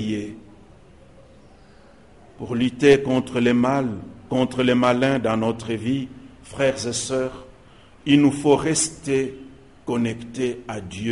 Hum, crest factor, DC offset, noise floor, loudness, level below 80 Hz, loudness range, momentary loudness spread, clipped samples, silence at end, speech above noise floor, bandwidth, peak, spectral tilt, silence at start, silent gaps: none; 20 dB; 0.2%; -50 dBFS; -22 LUFS; -52 dBFS; 4 LU; 16 LU; under 0.1%; 0 s; 29 dB; 11.5 kHz; -2 dBFS; -5 dB/octave; 0 s; none